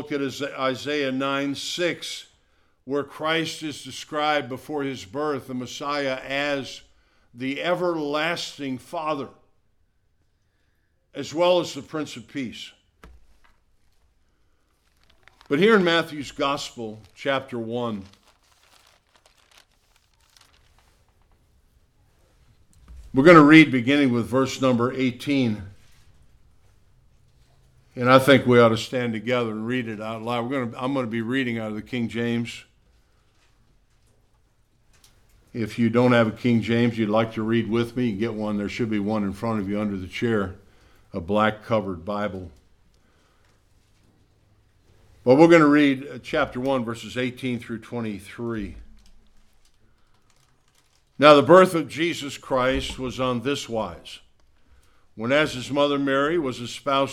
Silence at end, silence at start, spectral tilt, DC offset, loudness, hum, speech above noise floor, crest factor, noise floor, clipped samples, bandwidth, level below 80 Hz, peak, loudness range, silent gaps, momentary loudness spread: 0 s; 0 s; -5.5 dB/octave; under 0.1%; -22 LUFS; none; 44 dB; 24 dB; -66 dBFS; under 0.1%; 15 kHz; -54 dBFS; 0 dBFS; 14 LU; none; 17 LU